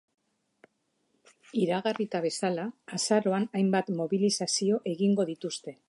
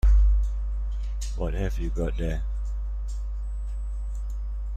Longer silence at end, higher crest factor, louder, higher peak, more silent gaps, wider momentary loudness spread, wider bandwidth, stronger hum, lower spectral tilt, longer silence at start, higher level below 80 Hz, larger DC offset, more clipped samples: first, 0.15 s vs 0 s; about the same, 18 dB vs 14 dB; about the same, -29 LUFS vs -30 LUFS; about the same, -12 dBFS vs -12 dBFS; neither; about the same, 8 LU vs 9 LU; first, 11.5 kHz vs 8.4 kHz; neither; second, -4.5 dB/octave vs -7 dB/octave; first, 1.55 s vs 0.05 s; second, -80 dBFS vs -26 dBFS; neither; neither